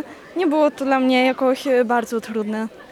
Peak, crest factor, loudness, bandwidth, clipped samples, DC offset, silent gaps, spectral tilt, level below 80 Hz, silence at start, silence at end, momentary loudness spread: -6 dBFS; 14 dB; -19 LUFS; 13.5 kHz; under 0.1%; under 0.1%; none; -4.5 dB/octave; -66 dBFS; 0 s; 0.05 s; 9 LU